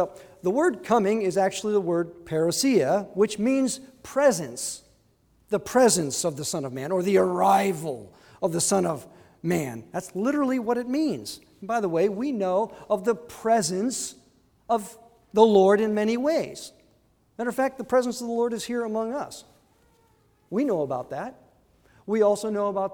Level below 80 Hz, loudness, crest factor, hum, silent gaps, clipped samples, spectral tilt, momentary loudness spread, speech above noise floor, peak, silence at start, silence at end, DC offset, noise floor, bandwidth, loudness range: -64 dBFS; -25 LUFS; 22 dB; none; none; under 0.1%; -4.5 dB/octave; 14 LU; 39 dB; -4 dBFS; 0 s; 0 s; under 0.1%; -63 dBFS; over 20 kHz; 5 LU